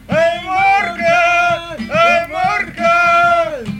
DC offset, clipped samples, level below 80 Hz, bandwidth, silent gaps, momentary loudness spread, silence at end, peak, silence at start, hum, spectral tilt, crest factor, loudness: under 0.1%; under 0.1%; -44 dBFS; 13.5 kHz; none; 6 LU; 0 s; -4 dBFS; 0.1 s; none; -4.5 dB/octave; 10 dB; -13 LUFS